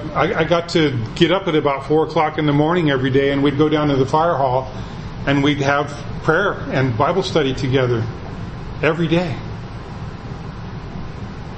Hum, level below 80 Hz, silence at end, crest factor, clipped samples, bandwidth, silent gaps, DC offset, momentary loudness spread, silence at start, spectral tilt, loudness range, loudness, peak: none; -38 dBFS; 0 s; 18 dB; under 0.1%; 8.6 kHz; none; under 0.1%; 15 LU; 0 s; -6.5 dB/octave; 5 LU; -18 LUFS; 0 dBFS